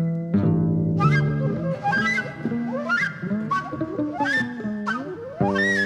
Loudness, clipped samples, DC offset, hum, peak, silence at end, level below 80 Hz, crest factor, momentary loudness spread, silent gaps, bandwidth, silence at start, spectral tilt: -23 LUFS; under 0.1%; under 0.1%; none; -8 dBFS; 0 s; -52 dBFS; 16 dB; 8 LU; none; 10 kHz; 0 s; -7 dB/octave